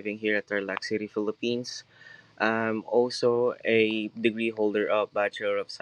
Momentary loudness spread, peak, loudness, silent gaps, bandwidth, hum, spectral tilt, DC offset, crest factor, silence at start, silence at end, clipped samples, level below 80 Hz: 7 LU; -8 dBFS; -27 LUFS; none; 10.5 kHz; none; -5 dB/octave; under 0.1%; 20 dB; 0 s; 0.05 s; under 0.1%; -80 dBFS